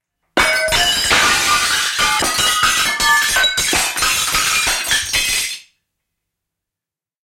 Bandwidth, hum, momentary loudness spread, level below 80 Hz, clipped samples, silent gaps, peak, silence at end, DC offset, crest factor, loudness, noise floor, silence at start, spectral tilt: 17 kHz; none; 4 LU; -38 dBFS; under 0.1%; none; 0 dBFS; 1.65 s; under 0.1%; 16 dB; -14 LUFS; -88 dBFS; 0.35 s; 0.5 dB/octave